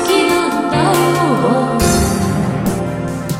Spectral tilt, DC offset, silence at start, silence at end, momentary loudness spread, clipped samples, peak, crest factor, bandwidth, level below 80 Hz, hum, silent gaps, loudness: -5 dB/octave; under 0.1%; 0 s; 0 s; 6 LU; under 0.1%; 0 dBFS; 14 dB; 16.5 kHz; -30 dBFS; none; none; -14 LUFS